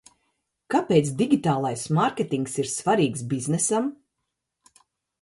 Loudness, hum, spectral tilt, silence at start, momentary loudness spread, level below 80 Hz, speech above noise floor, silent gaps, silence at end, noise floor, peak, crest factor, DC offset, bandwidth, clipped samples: -24 LUFS; none; -5.5 dB/octave; 0.7 s; 6 LU; -64 dBFS; 58 dB; none; 1.25 s; -81 dBFS; -6 dBFS; 18 dB; under 0.1%; 11.5 kHz; under 0.1%